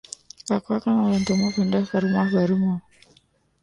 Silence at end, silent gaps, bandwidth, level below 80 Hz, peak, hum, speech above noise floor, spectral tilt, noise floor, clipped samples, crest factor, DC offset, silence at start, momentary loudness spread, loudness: 0.8 s; none; 11 kHz; -56 dBFS; -10 dBFS; none; 40 dB; -6.5 dB/octave; -61 dBFS; under 0.1%; 14 dB; under 0.1%; 0.45 s; 8 LU; -22 LUFS